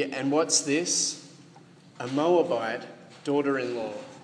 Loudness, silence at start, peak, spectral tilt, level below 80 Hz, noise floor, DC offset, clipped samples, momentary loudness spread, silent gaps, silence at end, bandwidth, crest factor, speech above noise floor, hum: -26 LUFS; 0 s; -10 dBFS; -3 dB/octave; -80 dBFS; -52 dBFS; under 0.1%; under 0.1%; 15 LU; none; 0 s; 10.5 kHz; 18 dB; 26 dB; none